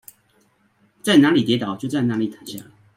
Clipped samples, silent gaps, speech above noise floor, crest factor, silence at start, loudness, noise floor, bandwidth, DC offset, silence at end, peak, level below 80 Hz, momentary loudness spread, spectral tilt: under 0.1%; none; 42 dB; 18 dB; 1.05 s; -19 LUFS; -61 dBFS; 16 kHz; under 0.1%; 0.35 s; -2 dBFS; -64 dBFS; 21 LU; -5.5 dB/octave